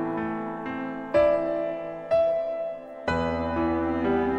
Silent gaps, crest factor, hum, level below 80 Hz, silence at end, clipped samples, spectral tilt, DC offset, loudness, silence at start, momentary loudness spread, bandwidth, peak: none; 14 dB; none; -48 dBFS; 0 s; under 0.1%; -8 dB/octave; under 0.1%; -27 LUFS; 0 s; 10 LU; 8.4 kHz; -12 dBFS